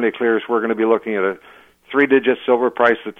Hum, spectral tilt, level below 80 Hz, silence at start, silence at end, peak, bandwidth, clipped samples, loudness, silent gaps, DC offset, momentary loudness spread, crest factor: none; -7 dB/octave; -66 dBFS; 0 s; 0.05 s; -2 dBFS; 4 kHz; under 0.1%; -17 LUFS; none; under 0.1%; 7 LU; 16 dB